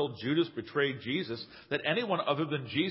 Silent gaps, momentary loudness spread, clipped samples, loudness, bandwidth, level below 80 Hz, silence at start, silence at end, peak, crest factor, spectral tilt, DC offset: none; 5 LU; under 0.1%; -32 LUFS; 5.8 kHz; -70 dBFS; 0 s; 0 s; -14 dBFS; 18 dB; -9.5 dB/octave; under 0.1%